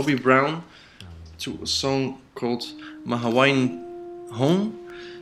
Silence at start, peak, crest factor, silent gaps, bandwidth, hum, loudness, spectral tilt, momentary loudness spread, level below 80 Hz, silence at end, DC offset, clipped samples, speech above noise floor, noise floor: 0 s; -2 dBFS; 22 dB; none; 14 kHz; none; -23 LUFS; -5 dB/octave; 19 LU; -56 dBFS; 0 s; under 0.1%; under 0.1%; 20 dB; -43 dBFS